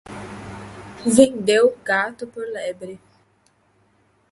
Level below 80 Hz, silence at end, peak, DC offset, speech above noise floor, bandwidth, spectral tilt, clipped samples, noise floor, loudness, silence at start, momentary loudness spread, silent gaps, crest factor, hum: -56 dBFS; 1.35 s; 0 dBFS; under 0.1%; 42 dB; 12 kHz; -4 dB/octave; under 0.1%; -61 dBFS; -19 LUFS; 0.1 s; 21 LU; none; 22 dB; none